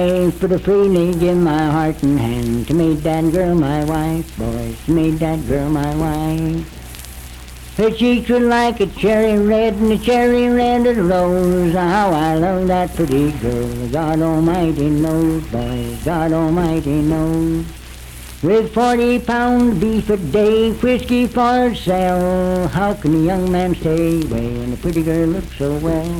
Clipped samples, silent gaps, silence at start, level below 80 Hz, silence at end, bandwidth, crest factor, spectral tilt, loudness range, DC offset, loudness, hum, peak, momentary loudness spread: under 0.1%; none; 0 s; -32 dBFS; 0 s; 19 kHz; 14 dB; -7 dB/octave; 4 LU; under 0.1%; -16 LUFS; none; -2 dBFS; 8 LU